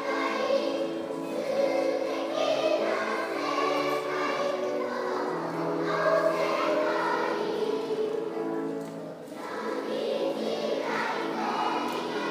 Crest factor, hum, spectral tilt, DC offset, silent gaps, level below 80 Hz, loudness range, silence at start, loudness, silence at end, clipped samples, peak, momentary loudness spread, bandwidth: 16 dB; none; -4.5 dB/octave; under 0.1%; none; -82 dBFS; 4 LU; 0 s; -29 LUFS; 0 s; under 0.1%; -12 dBFS; 6 LU; 15.5 kHz